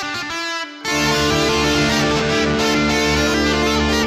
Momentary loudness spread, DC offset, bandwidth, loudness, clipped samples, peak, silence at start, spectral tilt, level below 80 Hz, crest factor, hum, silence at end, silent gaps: 7 LU; under 0.1%; 16 kHz; -17 LUFS; under 0.1%; -6 dBFS; 0 s; -3.5 dB/octave; -32 dBFS; 12 dB; none; 0 s; none